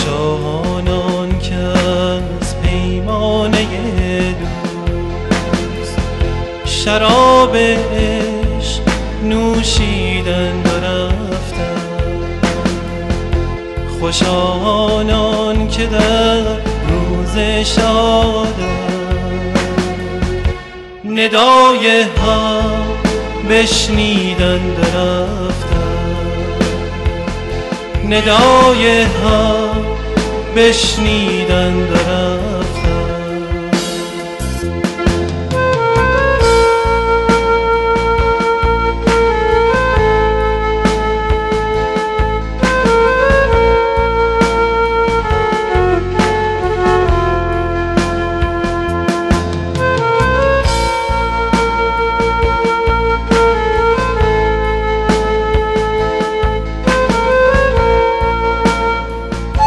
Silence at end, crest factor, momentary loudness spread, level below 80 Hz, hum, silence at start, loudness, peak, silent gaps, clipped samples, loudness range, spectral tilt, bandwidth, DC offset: 0 s; 12 dB; 9 LU; -22 dBFS; none; 0 s; -14 LUFS; 0 dBFS; none; under 0.1%; 5 LU; -5 dB/octave; 12 kHz; under 0.1%